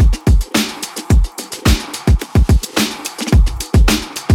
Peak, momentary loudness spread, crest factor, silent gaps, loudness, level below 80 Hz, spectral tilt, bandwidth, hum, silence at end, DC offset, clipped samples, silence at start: -2 dBFS; 6 LU; 12 dB; none; -16 LUFS; -16 dBFS; -5 dB/octave; 17 kHz; none; 0 s; under 0.1%; under 0.1%; 0 s